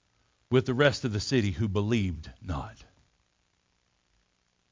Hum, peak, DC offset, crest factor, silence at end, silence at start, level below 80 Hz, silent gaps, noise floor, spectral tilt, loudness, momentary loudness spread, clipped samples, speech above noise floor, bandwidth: none; -10 dBFS; under 0.1%; 22 dB; 1.9 s; 0.5 s; -48 dBFS; none; -73 dBFS; -6 dB/octave; -28 LUFS; 12 LU; under 0.1%; 46 dB; 7.6 kHz